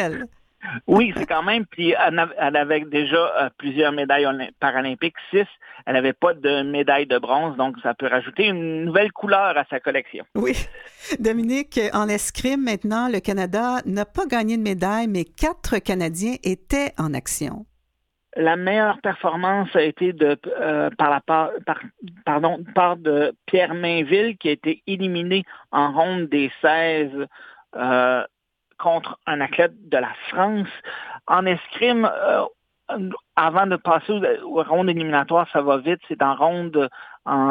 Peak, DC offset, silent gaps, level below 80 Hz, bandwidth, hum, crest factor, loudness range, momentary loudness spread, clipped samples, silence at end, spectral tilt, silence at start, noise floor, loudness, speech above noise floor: -2 dBFS; under 0.1%; none; -46 dBFS; 17 kHz; none; 20 dB; 3 LU; 8 LU; under 0.1%; 0 s; -4.5 dB/octave; 0 s; -73 dBFS; -21 LUFS; 52 dB